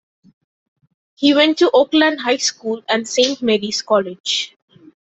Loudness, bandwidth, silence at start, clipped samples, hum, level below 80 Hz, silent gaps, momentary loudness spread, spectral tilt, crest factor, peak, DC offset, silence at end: -16 LUFS; 8.4 kHz; 1.2 s; under 0.1%; none; -64 dBFS; 4.20-4.24 s; 7 LU; -2.5 dB/octave; 16 dB; -2 dBFS; under 0.1%; 0.7 s